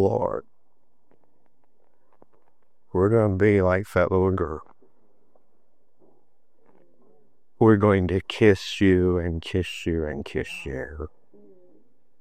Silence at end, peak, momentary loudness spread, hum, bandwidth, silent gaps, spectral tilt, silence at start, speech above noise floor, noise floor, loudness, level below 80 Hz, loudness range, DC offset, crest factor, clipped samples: 1.15 s; -4 dBFS; 14 LU; none; 14 kHz; none; -7.5 dB/octave; 0 s; 50 dB; -72 dBFS; -23 LUFS; -50 dBFS; 8 LU; 0.4%; 22 dB; under 0.1%